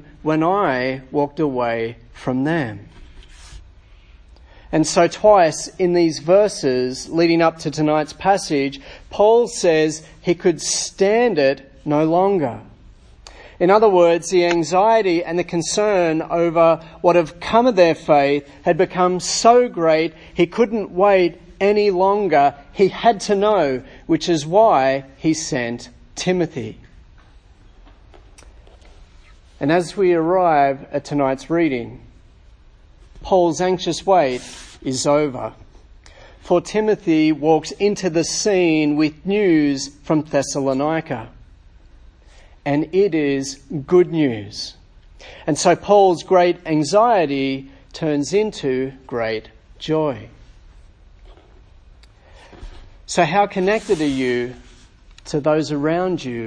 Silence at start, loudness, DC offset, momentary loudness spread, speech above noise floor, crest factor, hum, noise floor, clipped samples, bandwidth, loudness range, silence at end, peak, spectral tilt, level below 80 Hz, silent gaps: 0.25 s; -18 LUFS; under 0.1%; 11 LU; 30 dB; 18 dB; none; -47 dBFS; under 0.1%; 10.5 kHz; 8 LU; 0 s; 0 dBFS; -5 dB/octave; -46 dBFS; none